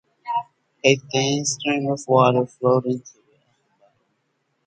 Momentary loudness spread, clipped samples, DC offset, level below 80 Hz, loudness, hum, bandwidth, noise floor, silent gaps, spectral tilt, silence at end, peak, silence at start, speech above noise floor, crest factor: 11 LU; under 0.1%; under 0.1%; -66 dBFS; -21 LUFS; none; 9.4 kHz; -71 dBFS; none; -4.5 dB/octave; 1.6 s; -2 dBFS; 0.25 s; 51 dB; 22 dB